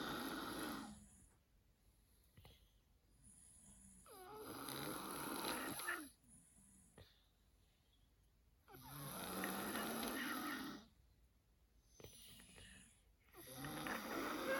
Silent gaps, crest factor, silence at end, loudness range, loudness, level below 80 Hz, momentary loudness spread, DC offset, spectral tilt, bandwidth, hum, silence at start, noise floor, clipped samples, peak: none; 22 dB; 0 s; 12 LU; -47 LUFS; -72 dBFS; 22 LU; under 0.1%; -3 dB/octave; 19.5 kHz; none; 0 s; -75 dBFS; under 0.1%; -30 dBFS